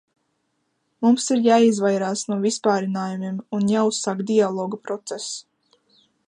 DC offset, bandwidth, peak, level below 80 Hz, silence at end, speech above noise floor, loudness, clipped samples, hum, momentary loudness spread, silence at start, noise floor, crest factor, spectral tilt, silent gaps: under 0.1%; 11 kHz; -4 dBFS; -72 dBFS; 0.9 s; 51 dB; -21 LUFS; under 0.1%; none; 13 LU; 1 s; -72 dBFS; 18 dB; -5 dB/octave; none